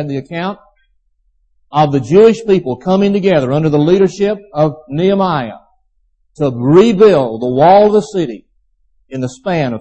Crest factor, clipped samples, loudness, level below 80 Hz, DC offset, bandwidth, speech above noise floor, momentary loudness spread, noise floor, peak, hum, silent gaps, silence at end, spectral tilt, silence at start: 12 dB; under 0.1%; -12 LUFS; -48 dBFS; under 0.1%; 8.6 kHz; 47 dB; 14 LU; -58 dBFS; 0 dBFS; none; none; 0 s; -7.5 dB/octave; 0 s